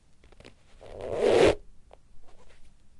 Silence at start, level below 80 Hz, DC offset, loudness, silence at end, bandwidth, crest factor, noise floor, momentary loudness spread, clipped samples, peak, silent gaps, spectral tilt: 0.8 s; -48 dBFS; under 0.1%; -24 LUFS; 0.3 s; 11.5 kHz; 20 dB; -53 dBFS; 21 LU; under 0.1%; -10 dBFS; none; -5 dB/octave